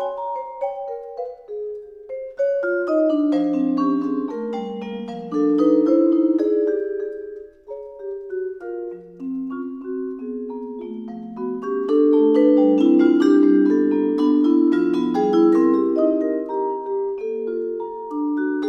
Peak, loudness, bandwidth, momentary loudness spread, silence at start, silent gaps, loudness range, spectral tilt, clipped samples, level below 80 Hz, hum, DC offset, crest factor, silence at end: -4 dBFS; -20 LUFS; 6 kHz; 17 LU; 0 s; none; 13 LU; -8 dB/octave; under 0.1%; -64 dBFS; none; under 0.1%; 16 dB; 0 s